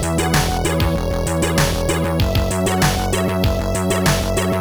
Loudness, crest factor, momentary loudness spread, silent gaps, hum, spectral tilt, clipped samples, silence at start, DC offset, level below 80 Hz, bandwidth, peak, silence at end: -18 LUFS; 14 dB; 3 LU; none; none; -4.5 dB/octave; under 0.1%; 0 s; under 0.1%; -26 dBFS; over 20 kHz; -4 dBFS; 0 s